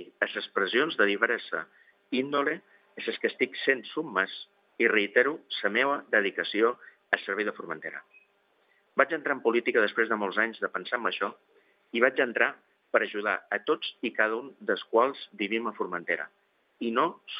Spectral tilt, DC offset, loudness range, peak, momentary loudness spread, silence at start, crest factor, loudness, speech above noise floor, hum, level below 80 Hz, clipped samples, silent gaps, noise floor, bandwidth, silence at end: -7 dB/octave; under 0.1%; 3 LU; -6 dBFS; 10 LU; 0 s; 24 dB; -28 LUFS; 40 dB; none; under -90 dBFS; under 0.1%; none; -68 dBFS; 5.2 kHz; 0 s